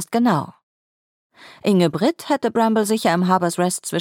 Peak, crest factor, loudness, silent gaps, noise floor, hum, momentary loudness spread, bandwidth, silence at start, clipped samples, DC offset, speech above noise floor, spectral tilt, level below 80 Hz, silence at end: -2 dBFS; 18 dB; -19 LUFS; 0.63-1.30 s; under -90 dBFS; none; 5 LU; 17 kHz; 0 s; under 0.1%; under 0.1%; over 71 dB; -5.5 dB/octave; -66 dBFS; 0 s